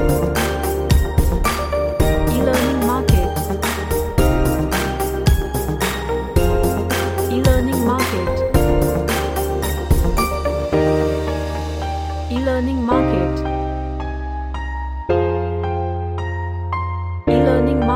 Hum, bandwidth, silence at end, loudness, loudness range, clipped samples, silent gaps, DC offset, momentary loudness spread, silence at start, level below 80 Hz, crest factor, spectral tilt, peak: none; 17 kHz; 0 s; -19 LUFS; 3 LU; under 0.1%; none; under 0.1%; 8 LU; 0 s; -24 dBFS; 16 dB; -6 dB/octave; -2 dBFS